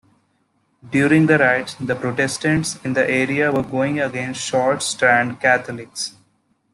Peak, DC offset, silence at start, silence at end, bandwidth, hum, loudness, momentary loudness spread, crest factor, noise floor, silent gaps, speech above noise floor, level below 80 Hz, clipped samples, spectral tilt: -2 dBFS; under 0.1%; 0.85 s; 0.65 s; 12.5 kHz; none; -18 LUFS; 10 LU; 18 dB; -65 dBFS; none; 46 dB; -56 dBFS; under 0.1%; -4.5 dB/octave